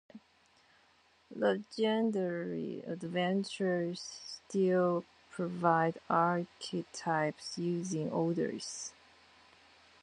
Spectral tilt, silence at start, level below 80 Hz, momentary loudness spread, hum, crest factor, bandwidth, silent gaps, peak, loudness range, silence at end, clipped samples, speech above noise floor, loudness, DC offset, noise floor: -5.5 dB/octave; 0.15 s; -78 dBFS; 11 LU; none; 22 dB; 10.5 kHz; none; -14 dBFS; 4 LU; 1.15 s; under 0.1%; 34 dB; -34 LUFS; under 0.1%; -68 dBFS